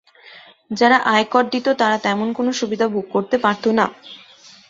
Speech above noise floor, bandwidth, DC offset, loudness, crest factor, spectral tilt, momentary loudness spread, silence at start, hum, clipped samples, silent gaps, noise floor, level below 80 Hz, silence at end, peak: 27 dB; 7.8 kHz; under 0.1%; -18 LUFS; 18 dB; -4.5 dB/octave; 8 LU; 0.25 s; none; under 0.1%; none; -45 dBFS; -64 dBFS; 0.55 s; -2 dBFS